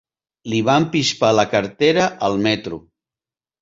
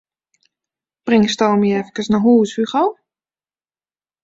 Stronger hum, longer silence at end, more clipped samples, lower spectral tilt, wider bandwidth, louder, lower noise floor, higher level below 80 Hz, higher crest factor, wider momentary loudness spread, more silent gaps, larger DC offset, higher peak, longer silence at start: neither; second, 0.85 s vs 1.3 s; neither; second, -4.5 dB/octave vs -6 dB/octave; about the same, 7.8 kHz vs 7.8 kHz; about the same, -18 LUFS vs -16 LUFS; about the same, under -90 dBFS vs under -90 dBFS; about the same, -54 dBFS vs -58 dBFS; about the same, 18 dB vs 16 dB; first, 11 LU vs 7 LU; neither; neither; about the same, -2 dBFS vs -2 dBFS; second, 0.45 s vs 1.05 s